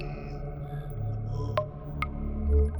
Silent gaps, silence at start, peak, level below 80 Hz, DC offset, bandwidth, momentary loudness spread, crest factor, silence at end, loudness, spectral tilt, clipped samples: none; 0 s; -14 dBFS; -32 dBFS; under 0.1%; over 20 kHz; 9 LU; 16 dB; 0 s; -33 LUFS; -8.5 dB/octave; under 0.1%